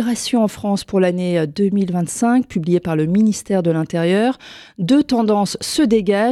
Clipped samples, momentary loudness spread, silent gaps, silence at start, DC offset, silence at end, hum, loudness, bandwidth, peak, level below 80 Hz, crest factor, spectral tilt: under 0.1%; 4 LU; none; 0 s; under 0.1%; 0 s; none; -17 LUFS; 13.5 kHz; -4 dBFS; -52 dBFS; 12 dB; -6 dB/octave